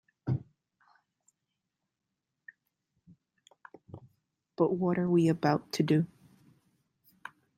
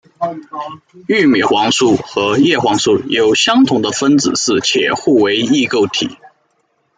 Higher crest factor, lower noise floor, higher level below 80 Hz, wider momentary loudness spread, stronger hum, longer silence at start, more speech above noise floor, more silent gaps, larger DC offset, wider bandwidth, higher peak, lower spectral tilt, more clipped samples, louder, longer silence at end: first, 22 dB vs 12 dB; first, -86 dBFS vs -62 dBFS; second, -72 dBFS vs -56 dBFS; first, 25 LU vs 11 LU; neither; about the same, 0.25 s vs 0.2 s; first, 59 dB vs 49 dB; neither; neither; first, 16 kHz vs 9.6 kHz; second, -12 dBFS vs -2 dBFS; first, -7.5 dB/octave vs -3.5 dB/octave; neither; second, -30 LUFS vs -13 LUFS; first, 1.5 s vs 0.85 s